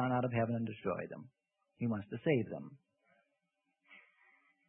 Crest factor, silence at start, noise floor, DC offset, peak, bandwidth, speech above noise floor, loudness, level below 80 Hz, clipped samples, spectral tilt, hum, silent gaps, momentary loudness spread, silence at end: 20 dB; 0 s; -84 dBFS; under 0.1%; -18 dBFS; 3.6 kHz; 47 dB; -37 LUFS; -74 dBFS; under 0.1%; -5.5 dB/octave; none; none; 14 LU; 0.7 s